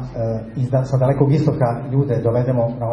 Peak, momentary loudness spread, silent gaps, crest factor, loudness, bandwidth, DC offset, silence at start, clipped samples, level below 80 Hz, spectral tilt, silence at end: -2 dBFS; 8 LU; none; 16 dB; -19 LUFS; 7.2 kHz; under 0.1%; 0 s; under 0.1%; -42 dBFS; -10 dB/octave; 0 s